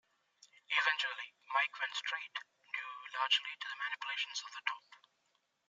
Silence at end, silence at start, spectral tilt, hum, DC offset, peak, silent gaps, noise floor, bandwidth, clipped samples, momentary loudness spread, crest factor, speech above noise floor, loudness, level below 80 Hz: 0.7 s; 0.7 s; 5 dB/octave; none; under 0.1%; -16 dBFS; none; -80 dBFS; 11.5 kHz; under 0.1%; 12 LU; 24 dB; 39 dB; -37 LUFS; under -90 dBFS